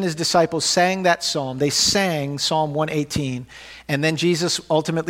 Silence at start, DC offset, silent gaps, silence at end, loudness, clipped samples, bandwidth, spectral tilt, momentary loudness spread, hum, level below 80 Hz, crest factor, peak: 0 s; under 0.1%; none; 0 s; -20 LUFS; under 0.1%; 16.5 kHz; -3.5 dB/octave; 8 LU; none; -52 dBFS; 18 dB; -2 dBFS